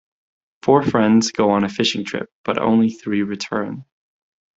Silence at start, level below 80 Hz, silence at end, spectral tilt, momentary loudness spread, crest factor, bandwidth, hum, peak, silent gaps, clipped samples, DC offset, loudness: 0.65 s; -56 dBFS; 0.75 s; -5 dB/octave; 11 LU; 20 dB; 7.8 kHz; none; 0 dBFS; 2.32-2.44 s; under 0.1%; under 0.1%; -19 LUFS